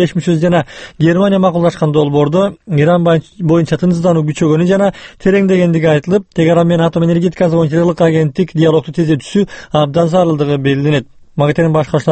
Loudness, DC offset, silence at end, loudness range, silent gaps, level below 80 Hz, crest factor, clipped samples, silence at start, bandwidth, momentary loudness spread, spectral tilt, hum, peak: -12 LUFS; under 0.1%; 0 s; 1 LU; none; -42 dBFS; 12 dB; under 0.1%; 0 s; 8.6 kHz; 5 LU; -7.5 dB/octave; none; 0 dBFS